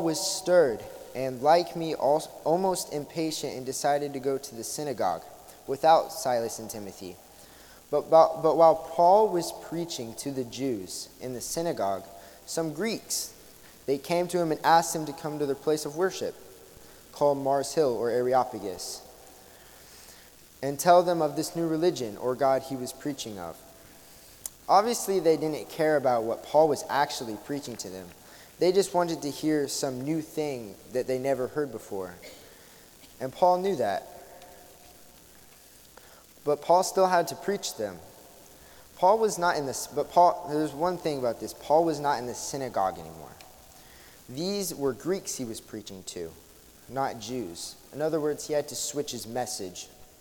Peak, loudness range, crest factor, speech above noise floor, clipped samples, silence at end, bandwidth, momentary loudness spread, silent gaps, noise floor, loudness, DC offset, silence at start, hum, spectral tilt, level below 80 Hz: -6 dBFS; 8 LU; 22 dB; 26 dB; under 0.1%; 0.15 s; 18 kHz; 17 LU; none; -53 dBFS; -27 LUFS; under 0.1%; 0 s; none; -4 dB/octave; -64 dBFS